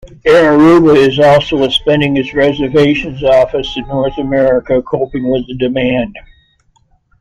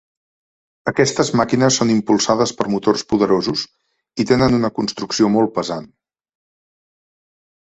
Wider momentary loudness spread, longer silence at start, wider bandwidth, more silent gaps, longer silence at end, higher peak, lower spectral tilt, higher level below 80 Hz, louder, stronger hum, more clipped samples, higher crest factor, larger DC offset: about the same, 10 LU vs 10 LU; second, 0.05 s vs 0.85 s; first, 11 kHz vs 8.2 kHz; neither; second, 1 s vs 1.9 s; about the same, 0 dBFS vs -2 dBFS; first, -6.5 dB/octave vs -4.5 dB/octave; first, -36 dBFS vs -48 dBFS; first, -11 LUFS vs -17 LUFS; neither; neither; second, 12 dB vs 18 dB; neither